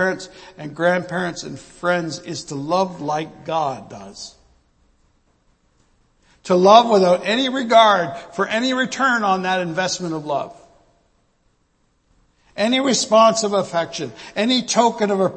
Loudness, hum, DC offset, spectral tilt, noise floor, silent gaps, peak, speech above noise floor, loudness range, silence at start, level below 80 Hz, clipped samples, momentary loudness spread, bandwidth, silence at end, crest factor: -18 LUFS; none; under 0.1%; -4 dB/octave; -64 dBFS; none; 0 dBFS; 45 dB; 11 LU; 0 s; -60 dBFS; under 0.1%; 21 LU; 8.8 kHz; 0 s; 20 dB